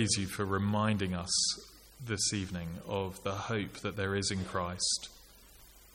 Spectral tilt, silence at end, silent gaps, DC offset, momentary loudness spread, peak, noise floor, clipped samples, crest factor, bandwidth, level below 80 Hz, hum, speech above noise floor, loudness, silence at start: -3.5 dB/octave; 0.1 s; none; under 0.1%; 10 LU; -16 dBFS; -57 dBFS; under 0.1%; 20 dB; 17 kHz; -58 dBFS; none; 23 dB; -33 LUFS; 0 s